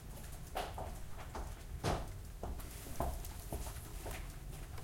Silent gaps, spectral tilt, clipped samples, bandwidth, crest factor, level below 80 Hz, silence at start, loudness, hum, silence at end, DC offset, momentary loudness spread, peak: none; -4.5 dB/octave; under 0.1%; 16.5 kHz; 22 dB; -48 dBFS; 0 s; -45 LUFS; none; 0 s; under 0.1%; 9 LU; -22 dBFS